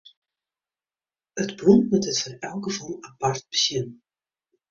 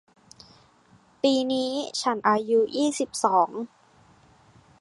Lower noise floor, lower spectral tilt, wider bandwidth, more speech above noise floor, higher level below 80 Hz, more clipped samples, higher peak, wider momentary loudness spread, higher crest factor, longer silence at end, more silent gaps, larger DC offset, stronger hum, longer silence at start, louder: first, under -90 dBFS vs -58 dBFS; about the same, -4.5 dB/octave vs -3.5 dB/octave; second, 7.6 kHz vs 11.5 kHz; first, over 67 dB vs 34 dB; first, -62 dBFS vs -70 dBFS; neither; about the same, -4 dBFS vs -6 dBFS; first, 15 LU vs 6 LU; about the same, 22 dB vs 20 dB; second, 0.75 s vs 1.15 s; neither; neither; neither; about the same, 1.35 s vs 1.25 s; about the same, -23 LUFS vs -24 LUFS